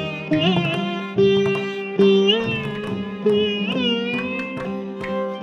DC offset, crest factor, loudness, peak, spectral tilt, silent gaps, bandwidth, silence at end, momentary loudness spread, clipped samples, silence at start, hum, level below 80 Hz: under 0.1%; 16 dB; -21 LUFS; -4 dBFS; -6.5 dB/octave; none; 10 kHz; 0 s; 10 LU; under 0.1%; 0 s; none; -54 dBFS